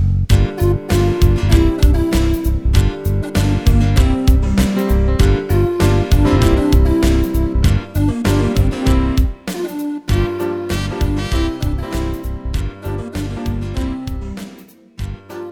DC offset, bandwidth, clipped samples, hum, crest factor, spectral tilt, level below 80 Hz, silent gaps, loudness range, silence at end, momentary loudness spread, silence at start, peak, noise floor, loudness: under 0.1%; 18 kHz; under 0.1%; none; 14 dB; -6.5 dB/octave; -18 dBFS; none; 8 LU; 0 s; 11 LU; 0 s; 0 dBFS; -41 dBFS; -17 LUFS